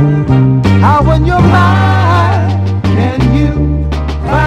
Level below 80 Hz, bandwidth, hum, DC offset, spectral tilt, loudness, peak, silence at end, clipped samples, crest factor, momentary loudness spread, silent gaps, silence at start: -20 dBFS; 8.2 kHz; none; under 0.1%; -8 dB/octave; -10 LUFS; 0 dBFS; 0 s; 0.9%; 8 dB; 6 LU; none; 0 s